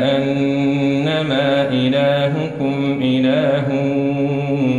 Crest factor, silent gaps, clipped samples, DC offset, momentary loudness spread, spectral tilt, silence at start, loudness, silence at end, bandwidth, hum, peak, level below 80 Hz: 12 dB; none; under 0.1%; under 0.1%; 4 LU; -7.5 dB/octave; 0 s; -17 LUFS; 0 s; 7.4 kHz; none; -4 dBFS; -54 dBFS